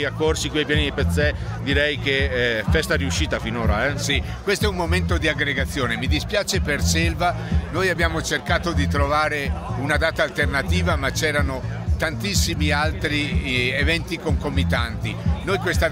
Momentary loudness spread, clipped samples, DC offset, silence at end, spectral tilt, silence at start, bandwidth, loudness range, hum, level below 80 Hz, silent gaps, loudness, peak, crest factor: 4 LU; under 0.1%; under 0.1%; 0 s; -4.5 dB/octave; 0 s; 16.5 kHz; 1 LU; none; -28 dBFS; none; -21 LUFS; -6 dBFS; 16 dB